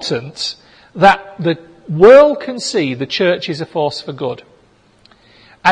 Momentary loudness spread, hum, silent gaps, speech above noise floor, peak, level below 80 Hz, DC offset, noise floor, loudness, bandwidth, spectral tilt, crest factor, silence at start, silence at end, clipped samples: 17 LU; none; none; 38 dB; 0 dBFS; -50 dBFS; under 0.1%; -51 dBFS; -14 LUFS; 10 kHz; -5 dB/octave; 14 dB; 0 s; 0 s; 0.2%